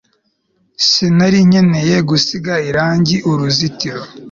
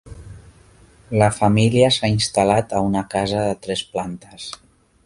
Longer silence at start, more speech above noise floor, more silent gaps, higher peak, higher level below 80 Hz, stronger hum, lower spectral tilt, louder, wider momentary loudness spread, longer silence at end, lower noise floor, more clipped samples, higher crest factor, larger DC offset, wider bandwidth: first, 0.8 s vs 0.05 s; first, 49 dB vs 31 dB; neither; about the same, 0 dBFS vs 0 dBFS; about the same, -48 dBFS vs -44 dBFS; neither; about the same, -5 dB/octave vs -5.5 dB/octave; first, -13 LUFS vs -19 LUFS; second, 9 LU vs 18 LU; second, 0.05 s vs 0.5 s; first, -62 dBFS vs -50 dBFS; neither; second, 14 dB vs 20 dB; neither; second, 7.4 kHz vs 11.5 kHz